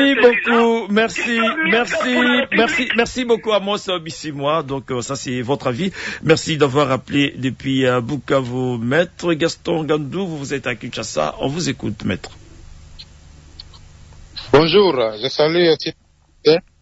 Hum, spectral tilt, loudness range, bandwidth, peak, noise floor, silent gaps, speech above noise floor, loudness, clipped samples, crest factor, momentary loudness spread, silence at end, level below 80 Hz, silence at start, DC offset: none; -5 dB/octave; 8 LU; 8 kHz; -2 dBFS; -43 dBFS; none; 25 dB; -18 LUFS; under 0.1%; 18 dB; 10 LU; 0.2 s; -48 dBFS; 0 s; under 0.1%